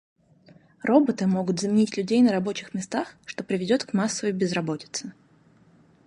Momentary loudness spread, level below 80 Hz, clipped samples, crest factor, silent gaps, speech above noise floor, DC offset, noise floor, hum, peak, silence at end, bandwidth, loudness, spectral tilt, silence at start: 12 LU; -68 dBFS; under 0.1%; 20 dB; none; 34 dB; under 0.1%; -58 dBFS; none; -4 dBFS; 0.95 s; 11.5 kHz; -25 LUFS; -5.5 dB/octave; 0.85 s